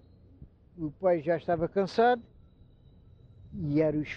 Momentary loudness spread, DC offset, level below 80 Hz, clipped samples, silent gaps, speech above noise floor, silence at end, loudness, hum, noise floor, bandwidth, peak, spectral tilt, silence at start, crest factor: 14 LU; under 0.1%; -58 dBFS; under 0.1%; none; 29 dB; 0 s; -29 LUFS; none; -57 dBFS; 7.8 kHz; -14 dBFS; -8 dB/octave; 0.4 s; 16 dB